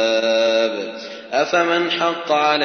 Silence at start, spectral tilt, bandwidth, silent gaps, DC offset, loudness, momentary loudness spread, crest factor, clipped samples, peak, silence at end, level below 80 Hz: 0 s; -3 dB/octave; 6.6 kHz; none; under 0.1%; -18 LUFS; 10 LU; 16 dB; under 0.1%; -4 dBFS; 0 s; -76 dBFS